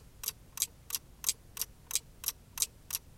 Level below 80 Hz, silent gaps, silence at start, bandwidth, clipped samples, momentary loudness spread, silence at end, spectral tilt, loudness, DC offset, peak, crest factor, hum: -58 dBFS; none; 0 s; 17 kHz; under 0.1%; 6 LU; 0 s; 1 dB/octave; -36 LUFS; under 0.1%; -10 dBFS; 30 dB; none